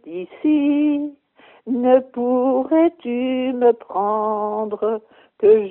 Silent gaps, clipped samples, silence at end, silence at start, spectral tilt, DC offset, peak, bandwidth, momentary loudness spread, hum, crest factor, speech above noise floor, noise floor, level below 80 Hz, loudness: none; under 0.1%; 0 s; 0.05 s; -5 dB/octave; under 0.1%; -2 dBFS; 3.8 kHz; 9 LU; none; 16 dB; 33 dB; -51 dBFS; -66 dBFS; -19 LUFS